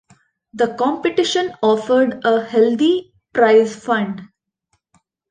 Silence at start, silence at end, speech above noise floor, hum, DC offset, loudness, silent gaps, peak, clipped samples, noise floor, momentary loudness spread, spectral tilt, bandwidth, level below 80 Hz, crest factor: 0.55 s; 1.05 s; 53 dB; none; under 0.1%; -17 LUFS; none; -2 dBFS; under 0.1%; -69 dBFS; 9 LU; -4.5 dB/octave; 9.6 kHz; -62 dBFS; 16 dB